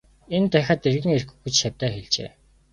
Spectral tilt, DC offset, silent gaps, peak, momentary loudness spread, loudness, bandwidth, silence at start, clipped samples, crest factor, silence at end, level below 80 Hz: -4.5 dB/octave; under 0.1%; none; -2 dBFS; 7 LU; -23 LUFS; 11 kHz; 0.3 s; under 0.1%; 20 dB; 0.45 s; -52 dBFS